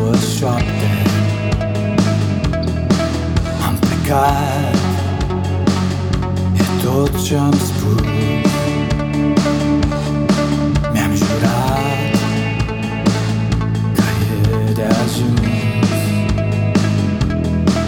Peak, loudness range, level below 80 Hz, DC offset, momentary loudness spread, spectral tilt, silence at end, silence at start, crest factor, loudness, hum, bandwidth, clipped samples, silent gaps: -2 dBFS; 1 LU; -30 dBFS; under 0.1%; 3 LU; -6 dB/octave; 0 s; 0 s; 14 dB; -16 LUFS; none; 19.5 kHz; under 0.1%; none